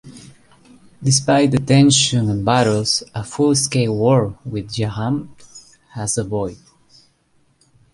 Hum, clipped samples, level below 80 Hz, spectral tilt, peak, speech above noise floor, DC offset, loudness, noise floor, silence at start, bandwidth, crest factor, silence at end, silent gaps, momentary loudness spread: none; under 0.1%; -48 dBFS; -4.5 dB/octave; -2 dBFS; 43 dB; under 0.1%; -17 LUFS; -60 dBFS; 0.05 s; 11.5 kHz; 16 dB; 1.35 s; none; 13 LU